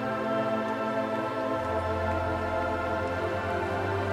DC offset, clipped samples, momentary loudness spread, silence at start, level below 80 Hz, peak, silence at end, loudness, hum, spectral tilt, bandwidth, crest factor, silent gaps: under 0.1%; under 0.1%; 1 LU; 0 s; -50 dBFS; -16 dBFS; 0 s; -29 LUFS; none; -7 dB/octave; 15.5 kHz; 12 dB; none